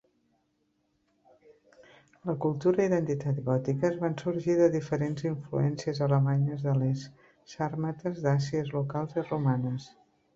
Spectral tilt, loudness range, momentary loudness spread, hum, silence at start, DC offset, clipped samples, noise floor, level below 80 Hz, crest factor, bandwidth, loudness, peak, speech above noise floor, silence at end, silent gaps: -8 dB/octave; 4 LU; 9 LU; none; 2.25 s; under 0.1%; under 0.1%; -74 dBFS; -66 dBFS; 18 dB; 7.6 kHz; -29 LUFS; -12 dBFS; 46 dB; 0.45 s; none